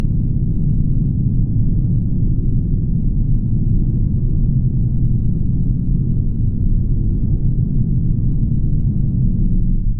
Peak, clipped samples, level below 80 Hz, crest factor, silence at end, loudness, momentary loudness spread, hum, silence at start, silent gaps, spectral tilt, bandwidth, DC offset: -4 dBFS; under 0.1%; -18 dBFS; 10 dB; 0 s; -19 LUFS; 1 LU; none; 0 s; none; -17 dB/octave; 0.9 kHz; under 0.1%